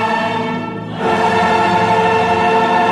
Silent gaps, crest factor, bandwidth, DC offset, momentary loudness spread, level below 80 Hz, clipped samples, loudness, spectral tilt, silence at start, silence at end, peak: none; 12 dB; 12.5 kHz; under 0.1%; 8 LU; -48 dBFS; under 0.1%; -14 LUFS; -5.5 dB/octave; 0 s; 0 s; -2 dBFS